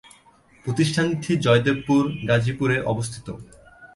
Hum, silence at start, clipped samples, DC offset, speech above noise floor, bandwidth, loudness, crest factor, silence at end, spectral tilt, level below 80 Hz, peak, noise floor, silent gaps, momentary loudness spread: none; 0.65 s; under 0.1%; under 0.1%; 33 dB; 11.5 kHz; -22 LUFS; 18 dB; 0.1 s; -6 dB/octave; -52 dBFS; -4 dBFS; -55 dBFS; none; 16 LU